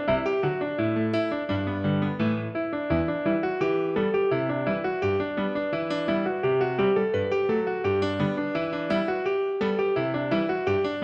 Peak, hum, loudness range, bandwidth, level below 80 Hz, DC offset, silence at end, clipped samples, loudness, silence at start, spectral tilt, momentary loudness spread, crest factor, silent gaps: -12 dBFS; none; 1 LU; 7.2 kHz; -52 dBFS; under 0.1%; 0 s; under 0.1%; -26 LUFS; 0 s; -8 dB/octave; 3 LU; 14 dB; none